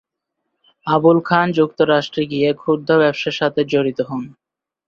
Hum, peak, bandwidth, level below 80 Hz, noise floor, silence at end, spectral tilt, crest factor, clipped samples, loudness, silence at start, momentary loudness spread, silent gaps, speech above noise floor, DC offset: none; -2 dBFS; 7.2 kHz; -60 dBFS; -77 dBFS; 0.6 s; -7 dB/octave; 16 dB; under 0.1%; -17 LUFS; 0.85 s; 11 LU; none; 60 dB; under 0.1%